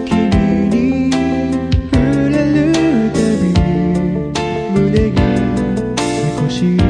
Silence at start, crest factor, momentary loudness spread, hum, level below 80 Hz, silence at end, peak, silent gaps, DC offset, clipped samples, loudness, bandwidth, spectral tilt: 0 s; 12 dB; 4 LU; none; -26 dBFS; 0 s; -2 dBFS; none; under 0.1%; under 0.1%; -14 LUFS; 10.5 kHz; -7 dB/octave